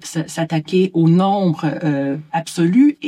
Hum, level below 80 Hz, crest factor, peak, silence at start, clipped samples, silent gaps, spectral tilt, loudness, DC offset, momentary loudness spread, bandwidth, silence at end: none; -66 dBFS; 12 dB; -4 dBFS; 0 s; under 0.1%; none; -7 dB/octave; -17 LUFS; under 0.1%; 9 LU; 13 kHz; 0 s